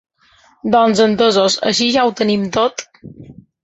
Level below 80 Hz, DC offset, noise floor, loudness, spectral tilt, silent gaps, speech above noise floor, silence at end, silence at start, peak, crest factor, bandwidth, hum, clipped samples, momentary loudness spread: -52 dBFS; under 0.1%; -52 dBFS; -14 LUFS; -4 dB/octave; none; 37 dB; 0.3 s; 0.65 s; -2 dBFS; 14 dB; 8.2 kHz; none; under 0.1%; 6 LU